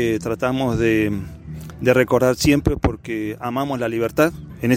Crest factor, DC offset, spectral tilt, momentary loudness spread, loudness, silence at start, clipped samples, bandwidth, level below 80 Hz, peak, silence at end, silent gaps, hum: 18 dB; under 0.1%; -6 dB/octave; 10 LU; -20 LUFS; 0 s; under 0.1%; 16.5 kHz; -36 dBFS; -2 dBFS; 0 s; none; none